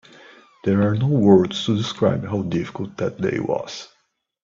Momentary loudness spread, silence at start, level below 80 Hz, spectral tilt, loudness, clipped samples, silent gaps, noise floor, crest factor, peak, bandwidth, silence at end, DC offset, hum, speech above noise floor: 13 LU; 0.65 s; -56 dBFS; -7 dB/octave; -21 LUFS; under 0.1%; none; -48 dBFS; 20 dB; -2 dBFS; 7.6 kHz; 0.6 s; under 0.1%; none; 28 dB